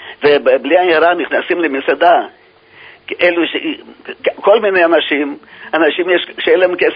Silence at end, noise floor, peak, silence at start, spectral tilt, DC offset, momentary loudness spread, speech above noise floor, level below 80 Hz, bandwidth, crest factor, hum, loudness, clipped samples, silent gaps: 0 s; -41 dBFS; 0 dBFS; 0 s; -7 dB/octave; under 0.1%; 12 LU; 28 dB; -60 dBFS; 5.2 kHz; 14 dB; none; -13 LUFS; under 0.1%; none